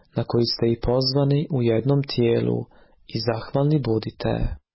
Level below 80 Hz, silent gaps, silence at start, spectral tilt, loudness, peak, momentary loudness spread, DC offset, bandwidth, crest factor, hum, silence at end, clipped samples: -40 dBFS; none; 0.15 s; -10.5 dB/octave; -23 LUFS; -10 dBFS; 7 LU; under 0.1%; 5.8 kHz; 14 dB; none; 0.15 s; under 0.1%